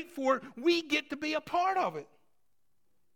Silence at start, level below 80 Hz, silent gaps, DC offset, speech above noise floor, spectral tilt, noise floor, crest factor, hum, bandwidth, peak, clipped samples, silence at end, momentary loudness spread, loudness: 0 s; -74 dBFS; none; under 0.1%; 51 dB; -3.5 dB/octave; -82 dBFS; 18 dB; none; 16.5 kHz; -16 dBFS; under 0.1%; 1.1 s; 5 LU; -31 LUFS